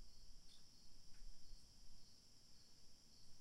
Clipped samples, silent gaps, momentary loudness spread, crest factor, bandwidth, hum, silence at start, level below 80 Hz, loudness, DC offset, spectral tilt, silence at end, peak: under 0.1%; none; 2 LU; 12 dB; 13.5 kHz; none; 0 s; -64 dBFS; -67 LUFS; under 0.1%; -2.5 dB/octave; 0 s; -42 dBFS